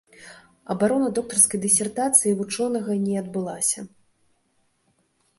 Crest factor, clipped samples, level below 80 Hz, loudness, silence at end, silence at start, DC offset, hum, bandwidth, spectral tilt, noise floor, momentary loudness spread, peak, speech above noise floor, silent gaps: 24 dB; under 0.1%; -66 dBFS; -21 LUFS; 1.5 s; 0.2 s; under 0.1%; none; 12 kHz; -3.5 dB/octave; -68 dBFS; 11 LU; -2 dBFS; 45 dB; none